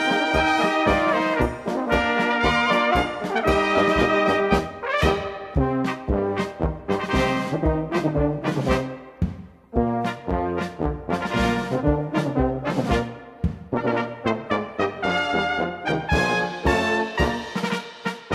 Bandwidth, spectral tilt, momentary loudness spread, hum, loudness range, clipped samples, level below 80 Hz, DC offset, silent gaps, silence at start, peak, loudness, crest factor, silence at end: 14.5 kHz; -6 dB/octave; 8 LU; none; 5 LU; under 0.1%; -34 dBFS; under 0.1%; none; 0 s; -6 dBFS; -23 LUFS; 18 dB; 0 s